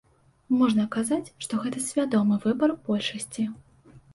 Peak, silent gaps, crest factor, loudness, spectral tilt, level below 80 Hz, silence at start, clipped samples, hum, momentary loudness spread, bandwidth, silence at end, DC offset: -12 dBFS; none; 16 dB; -26 LUFS; -5 dB/octave; -66 dBFS; 0.5 s; under 0.1%; none; 8 LU; 11.5 kHz; 0.15 s; under 0.1%